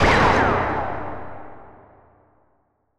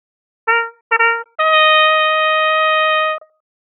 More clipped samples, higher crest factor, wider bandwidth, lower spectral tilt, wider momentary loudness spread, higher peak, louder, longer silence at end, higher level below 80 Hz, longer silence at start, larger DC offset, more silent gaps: neither; about the same, 18 dB vs 14 dB; first, 12 kHz vs 4.1 kHz; first, -5.5 dB/octave vs 9 dB/octave; first, 24 LU vs 9 LU; second, -4 dBFS vs 0 dBFS; second, -20 LUFS vs -13 LUFS; first, 1.3 s vs 0.55 s; first, -36 dBFS vs -84 dBFS; second, 0 s vs 0.45 s; neither; second, none vs 0.81-0.90 s